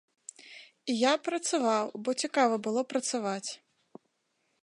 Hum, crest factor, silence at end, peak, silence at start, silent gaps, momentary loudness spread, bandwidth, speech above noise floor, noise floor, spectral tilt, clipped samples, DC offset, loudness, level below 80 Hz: none; 20 dB; 1.05 s; -12 dBFS; 0.45 s; none; 20 LU; 11.5 kHz; 47 dB; -77 dBFS; -3 dB/octave; under 0.1%; under 0.1%; -30 LUFS; -88 dBFS